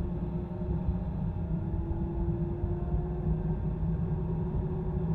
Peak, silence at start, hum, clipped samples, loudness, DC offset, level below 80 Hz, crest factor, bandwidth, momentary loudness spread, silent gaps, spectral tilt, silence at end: -18 dBFS; 0 s; none; under 0.1%; -33 LUFS; under 0.1%; -36 dBFS; 14 dB; 3.8 kHz; 2 LU; none; -12 dB/octave; 0 s